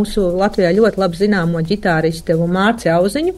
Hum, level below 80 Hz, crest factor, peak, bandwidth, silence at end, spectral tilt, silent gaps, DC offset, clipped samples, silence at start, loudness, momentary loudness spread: none; -36 dBFS; 14 dB; -2 dBFS; 12.5 kHz; 0 s; -6.5 dB/octave; none; under 0.1%; under 0.1%; 0 s; -15 LUFS; 4 LU